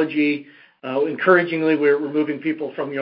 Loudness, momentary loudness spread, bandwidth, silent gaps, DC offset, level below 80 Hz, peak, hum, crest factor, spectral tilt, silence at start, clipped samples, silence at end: -20 LUFS; 11 LU; 5.4 kHz; none; under 0.1%; -70 dBFS; -2 dBFS; none; 20 dB; -9.5 dB/octave; 0 s; under 0.1%; 0 s